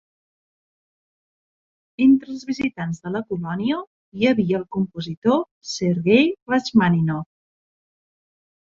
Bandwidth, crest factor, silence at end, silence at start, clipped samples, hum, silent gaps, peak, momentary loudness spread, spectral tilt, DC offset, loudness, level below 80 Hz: 7.6 kHz; 20 dB; 1.4 s; 2 s; under 0.1%; none; 3.87-4.12 s, 5.17-5.22 s, 5.51-5.61 s, 6.42-6.46 s; -2 dBFS; 12 LU; -6.5 dB/octave; under 0.1%; -21 LUFS; -60 dBFS